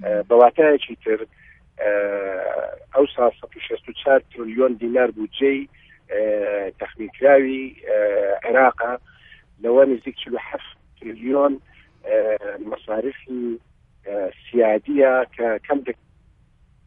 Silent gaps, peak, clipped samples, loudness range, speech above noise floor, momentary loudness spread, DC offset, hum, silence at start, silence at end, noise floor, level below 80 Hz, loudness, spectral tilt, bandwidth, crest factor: none; 0 dBFS; under 0.1%; 5 LU; 36 dB; 16 LU; under 0.1%; none; 0 s; 0.95 s; -56 dBFS; -56 dBFS; -20 LUFS; -8 dB/octave; 3.7 kHz; 20 dB